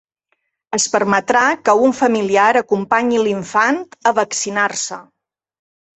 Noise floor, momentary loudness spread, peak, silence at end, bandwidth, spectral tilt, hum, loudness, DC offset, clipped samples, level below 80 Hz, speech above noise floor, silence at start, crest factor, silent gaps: -69 dBFS; 6 LU; -2 dBFS; 0.95 s; 8.6 kHz; -3 dB/octave; none; -16 LUFS; under 0.1%; under 0.1%; -62 dBFS; 53 dB; 0.7 s; 16 dB; none